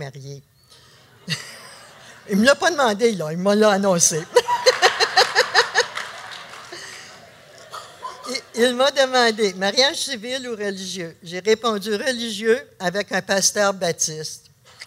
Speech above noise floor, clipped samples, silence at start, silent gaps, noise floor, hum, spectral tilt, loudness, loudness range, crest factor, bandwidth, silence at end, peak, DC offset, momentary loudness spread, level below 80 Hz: 30 dB; under 0.1%; 0 s; none; -50 dBFS; none; -2.5 dB/octave; -19 LUFS; 6 LU; 20 dB; 16 kHz; 0 s; -2 dBFS; under 0.1%; 19 LU; -66 dBFS